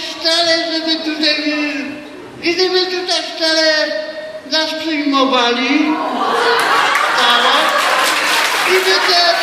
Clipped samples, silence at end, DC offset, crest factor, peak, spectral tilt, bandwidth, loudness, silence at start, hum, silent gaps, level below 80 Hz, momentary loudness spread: under 0.1%; 0 s; under 0.1%; 14 dB; 0 dBFS; -1 dB/octave; 16 kHz; -13 LUFS; 0 s; none; none; -62 dBFS; 8 LU